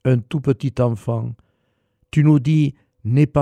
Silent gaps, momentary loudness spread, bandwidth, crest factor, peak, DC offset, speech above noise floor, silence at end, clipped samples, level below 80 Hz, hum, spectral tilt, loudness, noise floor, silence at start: none; 10 LU; 9.2 kHz; 16 dB; -4 dBFS; under 0.1%; 51 dB; 0 s; under 0.1%; -48 dBFS; none; -9 dB/octave; -19 LUFS; -68 dBFS; 0.05 s